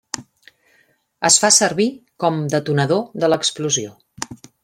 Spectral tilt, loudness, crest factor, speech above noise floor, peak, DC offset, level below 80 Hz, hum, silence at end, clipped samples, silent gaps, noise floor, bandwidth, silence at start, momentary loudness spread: -3 dB/octave; -17 LUFS; 20 dB; 42 dB; 0 dBFS; under 0.1%; -62 dBFS; none; 0.3 s; under 0.1%; none; -60 dBFS; 16.5 kHz; 0.15 s; 19 LU